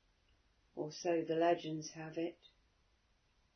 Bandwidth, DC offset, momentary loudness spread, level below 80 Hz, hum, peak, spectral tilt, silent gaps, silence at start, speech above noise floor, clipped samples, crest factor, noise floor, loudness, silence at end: 6.4 kHz; under 0.1%; 12 LU; -78 dBFS; none; -20 dBFS; -4.5 dB/octave; none; 0.75 s; 37 dB; under 0.1%; 20 dB; -75 dBFS; -39 LUFS; 1.2 s